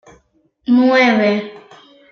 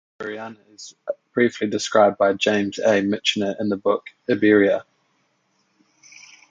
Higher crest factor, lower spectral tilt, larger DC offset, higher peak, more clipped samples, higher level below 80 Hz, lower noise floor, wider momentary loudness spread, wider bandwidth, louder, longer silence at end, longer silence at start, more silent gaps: second, 14 dB vs 20 dB; first, -6 dB/octave vs -4.5 dB/octave; neither; about the same, -2 dBFS vs -2 dBFS; neither; about the same, -62 dBFS vs -64 dBFS; second, -58 dBFS vs -67 dBFS; about the same, 17 LU vs 17 LU; second, 6.6 kHz vs 9.4 kHz; first, -14 LUFS vs -20 LUFS; second, 0.5 s vs 1.7 s; first, 0.7 s vs 0.2 s; neither